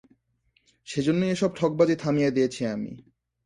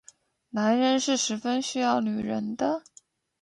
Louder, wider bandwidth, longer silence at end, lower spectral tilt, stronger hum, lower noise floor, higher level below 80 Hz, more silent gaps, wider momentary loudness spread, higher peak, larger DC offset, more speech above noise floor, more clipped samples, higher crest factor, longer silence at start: about the same, -25 LUFS vs -26 LUFS; about the same, 11.5 kHz vs 11 kHz; second, 0.45 s vs 0.65 s; first, -6.5 dB/octave vs -3.5 dB/octave; neither; first, -69 dBFS vs -58 dBFS; first, -62 dBFS vs -68 dBFS; neither; first, 10 LU vs 7 LU; first, -8 dBFS vs -12 dBFS; neither; first, 45 dB vs 32 dB; neither; about the same, 18 dB vs 16 dB; first, 0.85 s vs 0.55 s